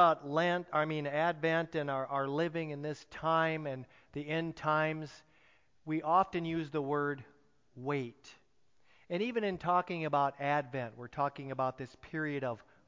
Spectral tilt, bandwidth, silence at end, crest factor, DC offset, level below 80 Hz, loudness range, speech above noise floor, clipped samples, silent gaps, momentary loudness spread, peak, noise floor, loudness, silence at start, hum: -7 dB/octave; 7.6 kHz; 0.3 s; 20 dB; under 0.1%; -70 dBFS; 3 LU; 39 dB; under 0.1%; none; 11 LU; -14 dBFS; -73 dBFS; -34 LUFS; 0 s; none